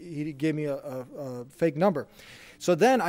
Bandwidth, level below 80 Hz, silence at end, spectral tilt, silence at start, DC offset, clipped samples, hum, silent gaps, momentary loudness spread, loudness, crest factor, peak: 16 kHz; -66 dBFS; 0 s; -6 dB/octave; 0 s; under 0.1%; under 0.1%; none; none; 17 LU; -28 LUFS; 16 dB; -12 dBFS